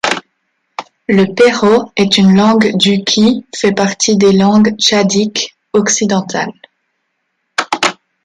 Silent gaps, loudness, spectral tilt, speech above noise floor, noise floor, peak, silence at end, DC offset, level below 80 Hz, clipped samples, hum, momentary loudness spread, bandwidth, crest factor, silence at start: none; -11 LUFS; -4 dB/octave; 57 dB; -68 dBFS; 0 dBFS; 0.3 s; under 0.1%; -52 dBFS; under 0.1%; none; 12 LU; 11.5 kHz; 12 dB; 0.05 s